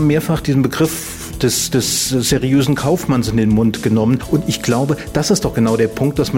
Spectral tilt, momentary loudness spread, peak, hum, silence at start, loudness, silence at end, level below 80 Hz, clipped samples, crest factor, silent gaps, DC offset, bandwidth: -5 dB/octave; 3 LU; -2 dBFS; none; 0 s; -16 LUFS; 0 s; -36 dBFS; under 0.1%; 12 dB; none; under 0.1%; 16.5 kHz